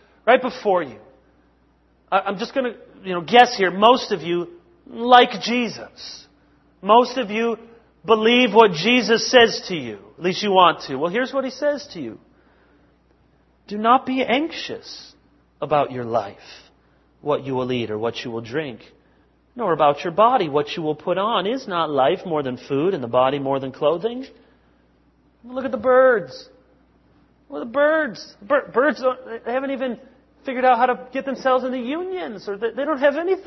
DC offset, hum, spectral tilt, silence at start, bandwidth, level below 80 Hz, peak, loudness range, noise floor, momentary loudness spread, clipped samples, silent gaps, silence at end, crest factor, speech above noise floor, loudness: under 0.1%; none; -4.5 dB/octave; 0.25 s; 6.2 kHz; -62 dBFS; 0 dBFS; 8 LU; -59 dBFS; 19 LU; under 0.1%; none; 0.05 s; 20 dB; 39 dB; -20 LUFS